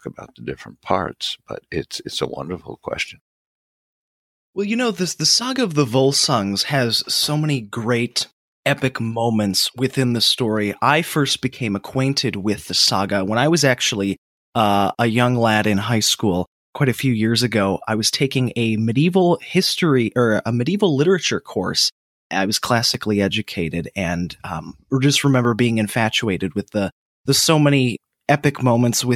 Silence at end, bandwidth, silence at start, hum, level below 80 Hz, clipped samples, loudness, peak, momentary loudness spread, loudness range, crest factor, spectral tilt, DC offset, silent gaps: 0 s; 16 kHz; 0.05 s; none; -54 dBFS; under 0.1%; -19 LUFS; -2 dBFS; 11 LU; 4 LU; 18 dB; -4.5 dB/octave; under 0.1%; 3.21-4.53 s, 8.33-8.63 s, 14.18-14.52 s, 16.47-16.73 s, 21.92-22.30 s, 26.92-27.24 s